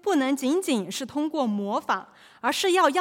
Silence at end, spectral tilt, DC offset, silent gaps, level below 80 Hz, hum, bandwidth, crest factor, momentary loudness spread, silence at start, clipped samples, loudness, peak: 0 s; -3.5 dB/octave; under 0.1%; none; -76 dBFS; none; 17 kHz; 18 dB; 8 LU; 0.05 s; under 0.1%; -25 LUFS; -6 dBFS